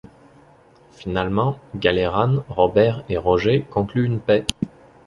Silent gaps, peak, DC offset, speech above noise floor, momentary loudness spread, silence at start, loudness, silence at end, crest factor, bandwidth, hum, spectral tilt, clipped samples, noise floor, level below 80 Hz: none; 0 dBFS; under 0.1%; 32 dB; 9 LU; 1 s; -21 LUFS; 0.4 s; 20 dB; 11.5 kHz; none; -6.5 dB/octave; under 0.1%; -51 dBFS; -44 dBFS